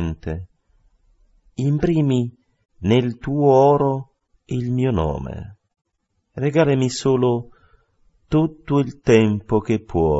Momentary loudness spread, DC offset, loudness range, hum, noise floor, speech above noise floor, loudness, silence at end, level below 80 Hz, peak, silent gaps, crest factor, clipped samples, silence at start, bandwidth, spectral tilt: 14 LU; under 0.1%; 4 LU; none; -70 dBFS; 52 dB; -20 LUFS; 0 s; -42 dBFS; 0 dBFS; none; 20 dB; under 0.1%; 0 s; 8 kHz; -7.5 dB/octave